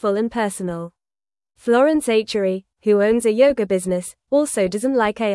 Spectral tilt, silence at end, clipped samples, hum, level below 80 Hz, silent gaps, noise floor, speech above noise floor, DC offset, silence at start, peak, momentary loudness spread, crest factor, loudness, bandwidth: -5 dB/octave; 0 s; under 0.1%; none; -54 dBFS; none; under -90 dBFS; over 72 dB; under 0.1%; 0.05 s; -4 dBFS; 10 LU; 16 dB; -19 LUFS; 12 kHz